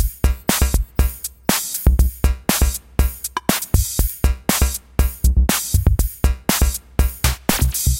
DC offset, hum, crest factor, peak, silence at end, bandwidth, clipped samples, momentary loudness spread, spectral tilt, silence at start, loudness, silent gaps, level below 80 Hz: under 0.1%; none; 18 dB; 0 dBFS; 0 s; 17.5 kHz; under 0.1%; 4 LU; -4 dB/octave; 0 s; -19 LUFS; none; -20 dBFS